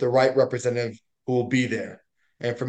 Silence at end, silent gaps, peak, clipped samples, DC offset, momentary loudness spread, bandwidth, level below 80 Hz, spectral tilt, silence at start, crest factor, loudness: 0 s; none; -6 dBFS; under 0.1%; under 0.1%; 13 LU; 9.2 kHz; -70 dBFS; -6 dB/octave; 0 s; 18 dB; -24 LUFS